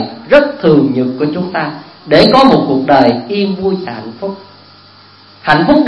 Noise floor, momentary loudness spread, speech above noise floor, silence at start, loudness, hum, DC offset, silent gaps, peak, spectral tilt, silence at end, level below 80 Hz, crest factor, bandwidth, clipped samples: -40 dBFS; 16 LU; 30 dB; 0 s; -11 LUFS; none; under 0.1%; none; 0 dBFS; -7 dB/octave; 0 s; -42 dBFS; 12 dB; 10.5 kHz; 0.6%